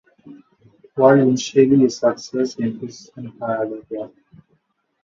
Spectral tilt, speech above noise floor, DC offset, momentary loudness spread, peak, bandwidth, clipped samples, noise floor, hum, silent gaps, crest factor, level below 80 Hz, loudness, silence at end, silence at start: -6 dB/octave; 49 dB; under 0.1%; 20 LU; -2 dBFS; 7.6 kHz; under 0.1%; -67 dBFS; none; none; 18 dB; -62 dBFS; -18 LUFS; 0.95 s; 0.25 s